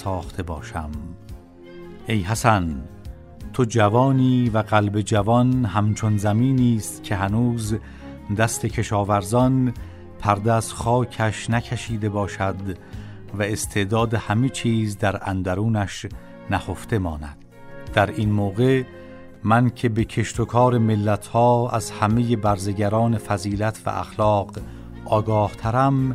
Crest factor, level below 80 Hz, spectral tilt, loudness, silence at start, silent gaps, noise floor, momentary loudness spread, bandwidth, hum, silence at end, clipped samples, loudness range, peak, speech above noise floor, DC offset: 20 dB; -42 dBFS; -6.5 dB/octave; -22 LUFS; 0 s; none; -41 dBFS; 17 LU; 14 kHz; none; 0 s; under 0.1%; 5 LU; -2 dBFS; 20 dB; under 0.1%